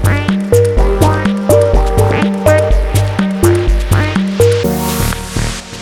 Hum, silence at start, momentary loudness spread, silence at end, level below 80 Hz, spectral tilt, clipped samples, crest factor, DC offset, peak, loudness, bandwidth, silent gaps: none; 0 s; 5 LU; 0 s; -18 dBFS; -6 dB/octave; under 0.1%; 10 dB; under 0.1%; 0 dBFS; -12 LUFS; 19 kHz; none